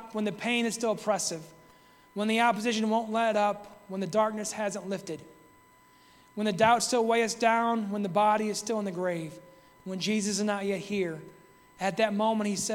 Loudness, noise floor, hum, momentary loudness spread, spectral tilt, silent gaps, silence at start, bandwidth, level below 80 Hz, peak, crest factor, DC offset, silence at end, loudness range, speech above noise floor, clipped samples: -28 LUFS; -59 dBFS; none; 13 LU; -4 dB/octave; none; 0 s; 17 kHz; -70 dBFS; -10 dBFS; 20 dB; under 0.1%; 0 s; 5 LU; 31 dB; under 0.1%